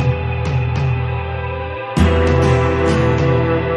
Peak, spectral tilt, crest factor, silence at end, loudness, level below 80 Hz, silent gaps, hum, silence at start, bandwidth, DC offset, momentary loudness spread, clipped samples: -2 dBFS; -7.5 dB/octave; 14 dB; 0 s; -17 LUFS; -26 dBFS; none; none; 0 s; 11 kHz; under 0.1%; 9 LU; under 0.1%